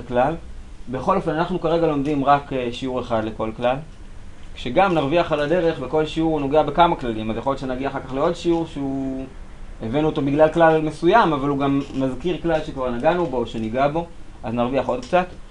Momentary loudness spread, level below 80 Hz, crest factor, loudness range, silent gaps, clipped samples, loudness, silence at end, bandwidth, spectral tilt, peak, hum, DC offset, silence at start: 10 LU; -38 dBFS; 20 dB; 4 LU; none; under 0.1%; -21 LUFS; 0 s; 10.5 kHz; -7 dB/octave; -2 dBFS; none; 0.1%; 0 s